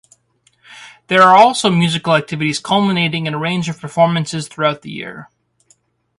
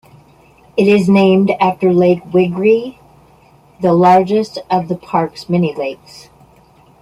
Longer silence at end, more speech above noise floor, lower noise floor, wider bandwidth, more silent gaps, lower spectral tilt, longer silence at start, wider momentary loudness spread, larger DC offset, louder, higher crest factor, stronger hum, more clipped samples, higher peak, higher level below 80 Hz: about the same, 0.95 s vs 1.05 s; first, 44 dB vs 34 dB; first, -59 dBFS vs -47 dBFS; about the same, 11.5 kHz vs 11.5 kHz; neither; second, -5 dB/octave vs -7.5 dB/octave; about the same, 0.7 s vs 0.75 s; first, 14 LU vs 9 LU; neither; about the same, -14 LUFS vs -13 LUFS; about the same, 16 dB vs 14 dB; neither; neither; about the same, 0 dBFS vs 0 dBFS; about the same, -58 dBFS vs -54 dBFS